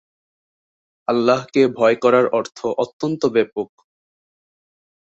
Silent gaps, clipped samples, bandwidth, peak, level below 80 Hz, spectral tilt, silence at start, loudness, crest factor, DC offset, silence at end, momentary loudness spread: 2.93-3.00 s; under 0.1%; 8 kHz; -2 dBFS; -64 dBFS; -6 dB/octave; 1.1 s; -18 LUFS; 18 dB; under 0.1%; 1.4 s; 10 LU